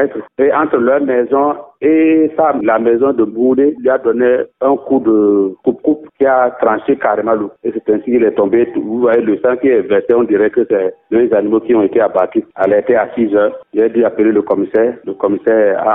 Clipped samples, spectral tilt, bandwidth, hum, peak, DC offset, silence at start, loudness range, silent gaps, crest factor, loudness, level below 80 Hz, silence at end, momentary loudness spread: under 0.1%; -10 dB/octave; 3.7 kHz; none; 0 dBFS; 0.2%; 0 s; 1 LU; none; 12 dB; -13 LUFS; -58 dBFS; 0 s; 5 LU